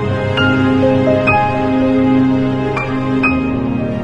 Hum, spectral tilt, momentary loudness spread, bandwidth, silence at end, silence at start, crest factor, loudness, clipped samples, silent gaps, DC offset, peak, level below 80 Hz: none; -8 dB/octave; 5 LU; 7.8 kHz; 0 s; 0 s; 14 dB; -14 LUFS; under 0.1%; none; under 0.1%; 0 dBFS; -36 dBFS